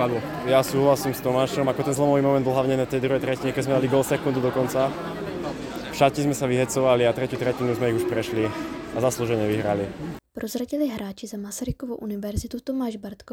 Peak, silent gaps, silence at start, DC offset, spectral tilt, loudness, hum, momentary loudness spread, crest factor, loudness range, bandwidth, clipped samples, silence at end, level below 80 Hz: -4 dBFS; none; 0 s; under 0.1%; -5.5 dB/octave; -24 LUFS; none; 11 LU; 20 dB; 6 LU; 17.5 kHz; under 0.1%; 0 s; -48 dBFS